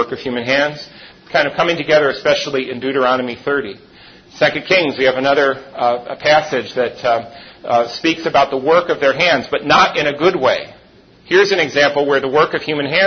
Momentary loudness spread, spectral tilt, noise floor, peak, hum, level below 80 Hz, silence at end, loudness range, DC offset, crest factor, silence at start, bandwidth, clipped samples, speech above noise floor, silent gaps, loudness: 8 LU; -4 dB/octave; -46 dBFS; 0 dBFS; none; -54 dBFS; 0 s; 3 LU; under 0.1%; 16 dB; 0 s; 6.6 kHz; under 0.1%; 31 dB; none; -15 LUFS